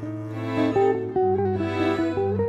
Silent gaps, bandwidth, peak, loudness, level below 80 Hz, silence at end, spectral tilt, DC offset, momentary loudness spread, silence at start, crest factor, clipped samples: none; 8 kHz; -10 dBFS; -24 LUFS; -56 dBFS; 0 s; -8 dB/octave; under 0.1%; 7 LU; 0 s; 12 dB; under 0.1%